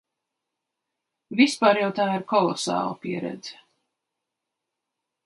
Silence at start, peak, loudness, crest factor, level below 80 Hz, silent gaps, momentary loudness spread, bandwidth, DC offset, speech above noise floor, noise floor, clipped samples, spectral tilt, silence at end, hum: 1.3 s; -4 dBFS; -23 LUFS; 22 dB; -76 dBFS; none; 14 LU; 11.5 kHz; under 0.1%; 61 dB; -84 dBFS; under 0.1%; -4.5 dB/octave; 1.75 s; none